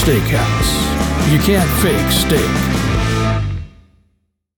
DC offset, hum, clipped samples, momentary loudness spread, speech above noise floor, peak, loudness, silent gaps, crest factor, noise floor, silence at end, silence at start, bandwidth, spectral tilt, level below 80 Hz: under 0.1%; none; under 0.1%; 4 LU; 51 dB; -2 dBFS; -15 LUFS; none; 14 dB; -64 dBFS; 0.9 s; 0 s; 19.5 kHz; -5 dB/octave; -24 dBFS